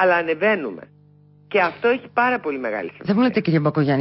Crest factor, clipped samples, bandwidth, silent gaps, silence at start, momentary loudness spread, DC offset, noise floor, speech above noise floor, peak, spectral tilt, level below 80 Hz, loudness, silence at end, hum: 14 dB; under 0.1%; 5.8 kHz; none; 0 s; 8 LU; under 0.1%; -51 dBFS; 32 dB; -6 dBFS; -11.5 dB/octave; -64 dBFS; -20 LUFS; 0 s; 50 Hz at -50 dBFS